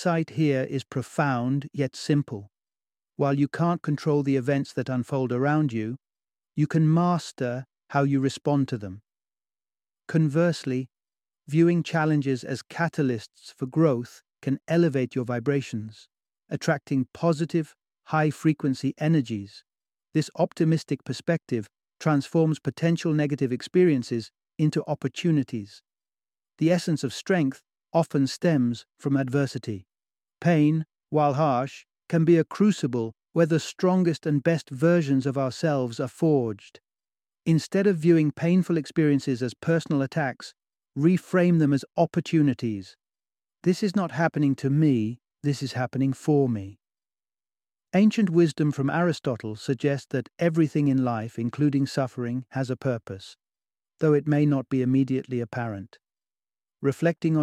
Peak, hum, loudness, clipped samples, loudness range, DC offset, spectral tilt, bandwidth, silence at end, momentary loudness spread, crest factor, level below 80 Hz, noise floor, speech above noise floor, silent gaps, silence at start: -8 dBFS; none; -25 LUFS; under 0.1%; 3 LU; under 0.1%; -7.5 dB/octave; 12 kHz; 0 s; 10 LU; 18 dB; -68 dBFS; under -90 dBFS; over 66 dB; none; 0 s